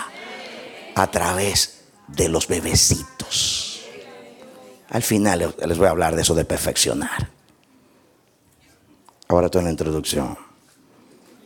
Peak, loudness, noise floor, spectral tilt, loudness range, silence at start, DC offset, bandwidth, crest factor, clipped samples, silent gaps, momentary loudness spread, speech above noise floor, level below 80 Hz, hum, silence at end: -2 dBFS; -20 LUFS; -58 dBFS; -3.5 dB/octave; 5 LU; 0 s; under 0.1%; 19 kHz; 22 dB; under 0.1%; none; 17 LU; 38 dB; -40 dBFS; none; 1 s